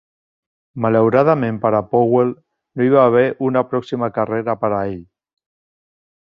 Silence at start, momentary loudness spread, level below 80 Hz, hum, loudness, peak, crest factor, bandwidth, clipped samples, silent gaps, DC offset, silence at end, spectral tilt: 0.75 s; 9 LU; -56 dBFS; none; -17 LUFS; 0 dBFS; 18 dB; 6.2 kHz; under 0.1%; none; under 0.1%; 1.2 s; -9.5 dB/octave